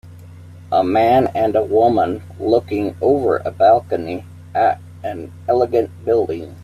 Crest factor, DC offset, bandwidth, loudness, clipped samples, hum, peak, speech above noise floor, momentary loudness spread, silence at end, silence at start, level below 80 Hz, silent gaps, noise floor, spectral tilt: 16 dB; under 0.1%; 14 kHz; -17 LUFS; under 0.1%; none; -2 dBFS; 21 dB; 13 LU; 0 s; 0.05 s; -56 dBFS; none; -38 dBFS; -8 dB/octave